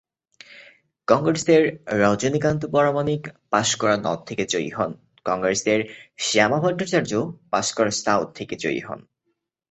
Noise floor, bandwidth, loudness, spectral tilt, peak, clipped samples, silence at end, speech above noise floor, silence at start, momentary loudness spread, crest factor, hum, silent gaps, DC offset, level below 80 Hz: -75 dBFS; 8.2 kHz; -22 LUFS; -4 dB/octave; -2 dBFS; under 0.1%; 0.7 s; 53 dB; 0.55 s; 10 LU; 20 dB; none; none; under 0.1%; -56 dBFS